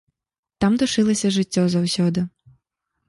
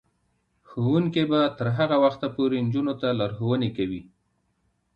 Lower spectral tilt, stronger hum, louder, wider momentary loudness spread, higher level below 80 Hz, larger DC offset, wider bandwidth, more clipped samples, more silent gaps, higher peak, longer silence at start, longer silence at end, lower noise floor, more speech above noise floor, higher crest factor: second, -5.5 dB/octave vs -9 dB/octave; neither; first, -20 LUFS vs -24 LUFS; second, 5 LU vs 8 LU; first, -52 dBFS vs -60 dBFS; neither; first, 11.5 kHz vs 6.6 kHz; neither; neither; about the same, -6 dBFS vs -8 dBFS; about the same, 0.6 s vs 0.7 s; second, 0.8 s vs 0.95 s; first, -86 dBFS vs -71 dBFS; first, 67 dB vs 48 dB; about the same, 16 dB vs 18 dB